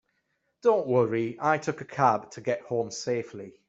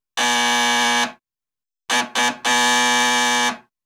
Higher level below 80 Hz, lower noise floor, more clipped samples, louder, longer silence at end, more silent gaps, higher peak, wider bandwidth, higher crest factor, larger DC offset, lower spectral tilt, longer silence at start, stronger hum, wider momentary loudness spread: about the same, -70 dBFS vs -72 dBFS; second, -76 dBFS vs under -90 dBFS; neither; second, -27 LUFS vs -17 LUFS; about the same, 0.2 s vs 0.25 s; neither; about the same, -8 dBFS vs -6 dBFS; second, 8 kHz vs 18 kHz; first, 20 dB vs 14 dB; neither; first, -5.5 dB/octave vs 0.5 dB/octave; first, 0.65 s vs 0.15 s; neither; about the same, 8 LU vs 6 LU